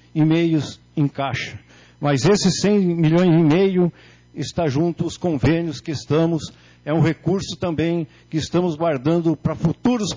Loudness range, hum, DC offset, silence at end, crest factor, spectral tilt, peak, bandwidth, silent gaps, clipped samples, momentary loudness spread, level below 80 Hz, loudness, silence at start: 4 LU; none; under 0.1%; 0 s; 12 dB; -6.5 dB/octave; -8 dBFS; 7.6 kHz; none; under 0.1%; 11 LU; -46 dBFS; -20 LUFS; 0.15 s